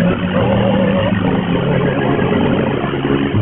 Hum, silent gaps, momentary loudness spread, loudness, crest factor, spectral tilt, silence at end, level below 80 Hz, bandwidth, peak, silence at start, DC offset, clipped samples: none; none; 3 LU; -15 LUFS; 12 dB; -6 dB/octave; 0 s; -34 dBFS; 3.9 kHz; -2 dBFS; 0 s; under 0.1%; under 0.1%